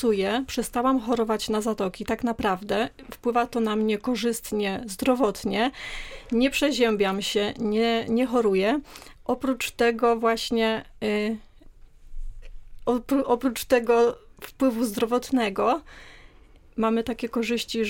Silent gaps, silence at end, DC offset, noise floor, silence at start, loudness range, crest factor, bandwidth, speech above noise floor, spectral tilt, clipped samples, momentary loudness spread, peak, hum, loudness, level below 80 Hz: none; 0 s; under 0.1%; -52 dBFS; 0 s; 3 LU; 16 dB; 17 kHz; 27 dB; -4.5 dB/octave; under 0.1%; 8 LU; -8 dBFS; none; -25 LUFS; -46 dBFS